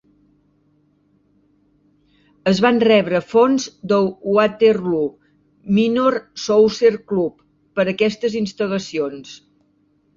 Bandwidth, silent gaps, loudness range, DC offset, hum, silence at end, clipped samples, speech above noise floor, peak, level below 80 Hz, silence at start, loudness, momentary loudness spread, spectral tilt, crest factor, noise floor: 7.6 kHz; none; 4 LU; under 0.1%; none; 0.8 s; under 0.1%; 44 dB; -2 dBFS; -60 dBFS; 2.45 s; -18 LUFS; 11 LU; -5.5 dB/octave; 18 dB; -61 dBFS